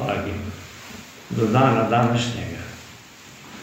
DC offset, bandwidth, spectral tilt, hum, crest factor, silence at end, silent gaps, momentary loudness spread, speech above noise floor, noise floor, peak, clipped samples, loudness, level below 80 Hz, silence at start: under 0.1%; 16 kHz; -6 dB/octave; none; 20 dB; 0 s; none; 24 LU; 24 dB; -44 dBFS; -4 dBFS; under 0.1%; -21 LUFS; -52 dBFS; 0 s